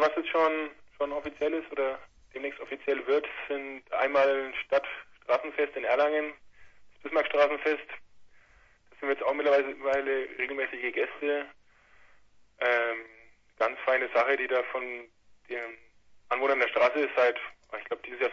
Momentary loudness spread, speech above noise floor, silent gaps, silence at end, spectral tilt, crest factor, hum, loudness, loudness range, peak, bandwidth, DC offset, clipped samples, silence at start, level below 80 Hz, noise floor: 13 LU; 32 dB; none; 0 s; -4 dB/octave; 20 dB; none; -29 LUFS; 3 LU; -10 dBFS; 7.2 kHz; under 0.1%; under 0.1%; 0 s; -68 dBFS; -61 dBFS